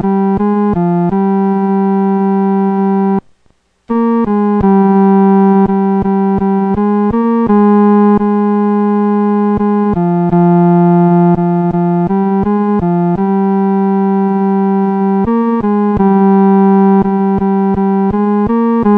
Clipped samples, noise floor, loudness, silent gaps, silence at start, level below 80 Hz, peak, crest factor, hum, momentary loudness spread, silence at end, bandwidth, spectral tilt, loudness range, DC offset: under 0.1%; -54 dBFS; -11 LUFS; none; 0 s; -38 dBFS; 0 dBFS; 10 dB; none; 4 LU; 0 s; 3.5 kHz; -12 dB/octave; 2 LU; under 0.1%